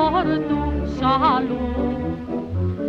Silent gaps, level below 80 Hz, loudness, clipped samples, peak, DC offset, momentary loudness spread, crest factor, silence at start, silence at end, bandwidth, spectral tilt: none; -34 dBFS; -22 LUFS; under 0.1%; -6 dBFS; under 0.1%; 9 LU; 16 dB; 0 s; 0 s; 7.2 kHz; -8.5 dB/octave